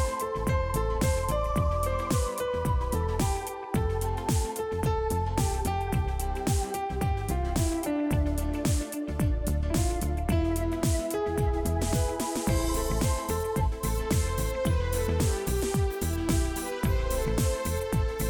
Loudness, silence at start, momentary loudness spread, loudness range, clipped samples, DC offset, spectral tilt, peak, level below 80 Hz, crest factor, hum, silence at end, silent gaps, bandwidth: -29 LUFS; 0 s; 3 LU; 1 LU; under 0.1%; under 0.1%; -5.5 dB/octave; -12 dBFS; -32 dBFS; 14 dB; none; 0 s; none; 19 kHz